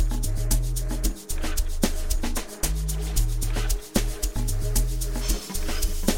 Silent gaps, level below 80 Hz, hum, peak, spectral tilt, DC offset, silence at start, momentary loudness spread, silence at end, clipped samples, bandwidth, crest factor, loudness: none; -26 dBFS; none; -8 dBFS; -4 dB/octave; under 0.1%; 0 s; 3 LU; 0 s; under 0.1%; 17 kHz; 16 dB; -28 LUFS